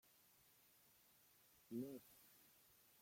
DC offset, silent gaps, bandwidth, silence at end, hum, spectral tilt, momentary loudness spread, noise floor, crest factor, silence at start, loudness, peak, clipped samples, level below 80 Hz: under 0.1%; none; 16.5 kHz; 0 s; none; -5.5 dB/octave; 17 LU; -74 dBFS; 22 dB; 0.05 s; -54 LUFS; -38 dBFS; under 0.1%; under -90 dBFS